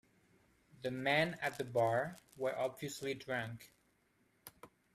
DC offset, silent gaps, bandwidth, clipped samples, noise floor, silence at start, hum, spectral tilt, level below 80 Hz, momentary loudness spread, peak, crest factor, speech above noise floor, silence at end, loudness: under 0.1%; none; 15.5 kHz; under 0.1%; -75 dBFS; 0.8 s; none; -5 dB/octave; -76 dBFS; 22 LU; -20 dBFS; 20 dB; 37 dB; 0.3 s; -38 LUFS